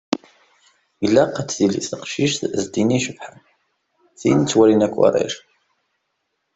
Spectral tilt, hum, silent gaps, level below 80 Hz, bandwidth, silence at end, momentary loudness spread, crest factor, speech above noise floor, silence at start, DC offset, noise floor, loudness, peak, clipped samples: -5 dB/octave; none; none; -56 dBFS; 8.2 kHz; 1.2 s; 13 LU; 18 dB; 56 dB; 0.1 s; under 0.1%; -74 dBFS; -19 LUFS; -2 dBFS; under 0.1%